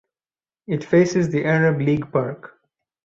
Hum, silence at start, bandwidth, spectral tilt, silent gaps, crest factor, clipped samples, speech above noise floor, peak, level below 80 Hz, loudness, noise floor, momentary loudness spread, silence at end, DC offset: none; 0.7 s; 7.6 kHz; -7.5 dB/octave; none; 16 dB; under 0.1%; over 71 dB; -6 dBFS; -58 dBFS; -20 LUFS; under -90 dBFS; 11 LU; 0.6 s; under 0.1%